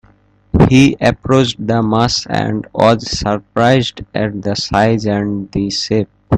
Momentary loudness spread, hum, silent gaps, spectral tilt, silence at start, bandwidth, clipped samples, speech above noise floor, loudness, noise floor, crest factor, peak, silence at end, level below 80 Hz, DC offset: 9 LU; none; none; -5.5 dB/octave; 0.55 s; 10.5 kHz; under 0.1%; 36 dB; -14 LUFS; -50 dBFS; 14 dB; 0 dBFS; 0 s; -34 dBFS; under 0.1%